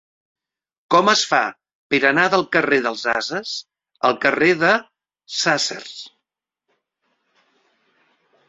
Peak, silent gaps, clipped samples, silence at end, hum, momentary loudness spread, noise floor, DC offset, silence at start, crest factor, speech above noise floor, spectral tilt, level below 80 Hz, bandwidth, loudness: -2 dBFS; 1.75-1.90 s; under 0.1%; 2.4 s; none; 13 LU; -82 dBFS; under 0.1%; 0.9 s; 20 dB; 63 dB; -3 dB/octave; -64 dBFS; 8.2 kHz; -18 LUFS